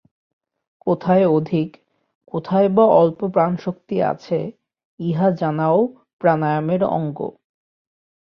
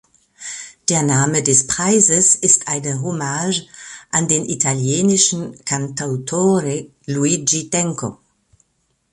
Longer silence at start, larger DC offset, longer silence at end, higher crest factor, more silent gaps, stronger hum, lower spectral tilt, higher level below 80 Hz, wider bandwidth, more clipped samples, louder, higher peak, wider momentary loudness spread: first, 0.85 s vs 0.4 s; neither; about the same, 1 s vs 1 s; about the same, 18 dB vs 18 dB; first, 2.15-2.21 s, 4.85-4.98 s, 6.13-6.19 s vs none; neither; first, -10 dB/octave vs -3.5 dB/octave; about the same, -60 dBFS vs -56 dBFS; second, 6.2 kHz vs 11.5 kHz; neither; second, -19 LUFS vs -16 LUFS; about the same, -2 dBFS vs 0 dBFS; about the same, 14 LU vs 15 LU